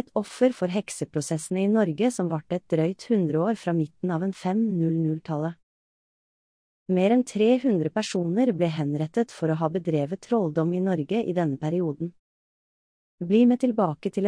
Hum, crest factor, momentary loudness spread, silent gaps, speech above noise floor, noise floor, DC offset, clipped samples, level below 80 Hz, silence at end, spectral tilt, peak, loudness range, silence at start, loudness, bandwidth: none; 16 dB; 8 LU; 5.63-6.86 s, 12.19-13.18 s; over 66 dB; under -90 dBFS; under 0.1%; under 0.1%; -70 dBFS; 0 s; -7 dB/octave; -10 dBFS; 3 LU; 0.15 s; -25 LUFS; 10.5 kHz